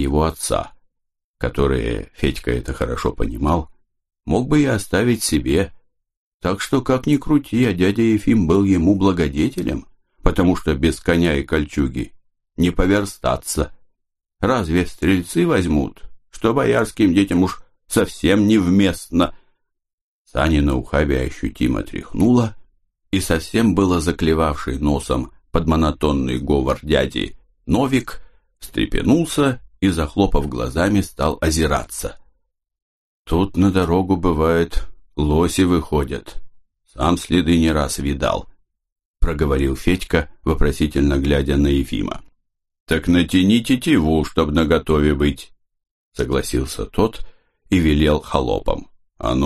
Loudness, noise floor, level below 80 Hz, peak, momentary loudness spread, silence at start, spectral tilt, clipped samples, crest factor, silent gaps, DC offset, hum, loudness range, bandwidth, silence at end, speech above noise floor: -19 LUFS; -75 dBFS; -30 dBFS; 0 dBFS; 9 LU; 0 s; -6 dB/octave; under 0.1%; 18 dB; 1.24-1.34 s, 6.17-6.40 s, 19.93-20.25 s, 32.82-33.25 s, 38.92-38.96 s, 39.05-39.14 s, 42.80-42.86 s, 45.91-46.11 s; under 0.1%; none; 4 LU; 13 kHz; 0 s; 58 dB